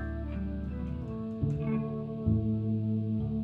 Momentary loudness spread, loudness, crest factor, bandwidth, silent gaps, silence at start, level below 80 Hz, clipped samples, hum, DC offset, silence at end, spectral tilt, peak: 7 LU; -33 LUFS; 16 dB; 4.2 kHz; none; 0 s; -42 dBFS; under 0.1%; none; under 0.1%; 0 s; -11 dB/octave; -16 dBFS